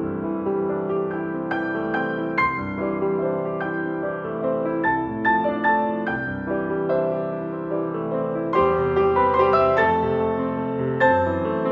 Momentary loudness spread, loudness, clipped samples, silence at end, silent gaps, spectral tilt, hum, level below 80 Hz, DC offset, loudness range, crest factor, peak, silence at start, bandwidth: 8 LU; -22 LUFS; under 0.1%; 0 s; none; -9 dB/octave; none; -50 dBFS; under 0.1%; 4 LU; 16 dB; -6 dBFS; 0 s; 5.8 kHz